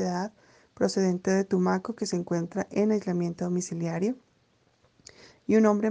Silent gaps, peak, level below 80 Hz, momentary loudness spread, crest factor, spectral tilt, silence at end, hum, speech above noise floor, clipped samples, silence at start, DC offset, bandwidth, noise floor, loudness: none; -10 dBFS; -70 dBFS; 8 LU; 18 dB; -6.5 dB/octave; 0 s; none; 41 dB; under 0.1%; 0 s; under 0.1%; 9.6 kHz; -67 dBFS; -28 LUFS